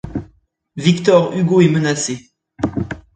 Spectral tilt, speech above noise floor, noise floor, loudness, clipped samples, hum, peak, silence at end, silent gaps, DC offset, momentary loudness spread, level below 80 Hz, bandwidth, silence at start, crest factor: -5.5 dB/octave; 40 dB; -54 dBFS; -16 LUFS; under 0.1%; none; 0 dBFS; 0.15 s; none; under 0.1%; 16 LU; -44 dBFS; 9.4 kHz; 0.05 s; 16 dB